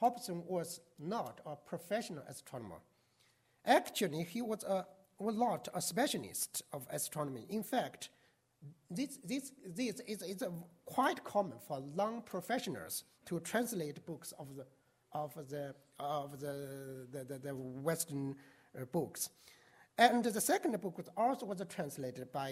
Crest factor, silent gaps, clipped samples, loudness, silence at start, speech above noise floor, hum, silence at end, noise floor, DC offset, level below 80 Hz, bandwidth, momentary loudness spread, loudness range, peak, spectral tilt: 26 dB; none; under 0.1%; -39 LUFS; 0 s; 34 dB; none; 0 s; -73 dBFS; under 0.1%; -82 dBFS; 16 kHz; 15 LU; 8 LU; -14 dBFS; -4 dB/octave